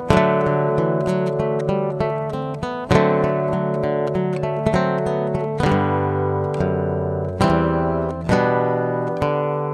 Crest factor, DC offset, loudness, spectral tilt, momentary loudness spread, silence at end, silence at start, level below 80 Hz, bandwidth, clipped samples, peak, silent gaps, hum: 20 dB; under 0.1%; -20 LUFS; -7.5 dB/octave; 5 LU; 0 s; 0 s; -40 dBFS; 12 kHz; under 0.1%; 0 dBFS; none; none